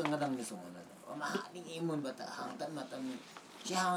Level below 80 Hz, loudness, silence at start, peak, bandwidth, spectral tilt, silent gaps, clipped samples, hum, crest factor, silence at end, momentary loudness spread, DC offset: under -90 dBFS; -41 LUFS; 0 s; -16 dBFS; over 20 kHz; -4 dB/octave; none; under 0.1%; none; 24 dB; 0 s; 12 LU; under 0.1%